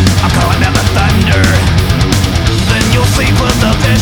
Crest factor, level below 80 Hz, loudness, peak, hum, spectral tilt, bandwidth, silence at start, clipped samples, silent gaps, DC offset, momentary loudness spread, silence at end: 8 dB; -18 dBFS; -10 LUFS; 0 dBFS; none; -5 dB/octave; over 20 kHz; 0 s; under 0.1%; none; under 0.1%; 2 LU; 0 s